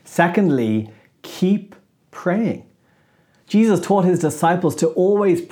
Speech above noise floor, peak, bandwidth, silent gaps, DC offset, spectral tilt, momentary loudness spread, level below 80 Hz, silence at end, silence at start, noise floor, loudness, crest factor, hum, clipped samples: 41 dB; 0 dBFS; 18.5 kHz; none; under 0.1%; -6.5 dB/octave; 9 LU; -70 dBFS; 0.05 s; 0.1 s; -58 dBFS; -18 LUFS; 18 dB; none; under 0.1%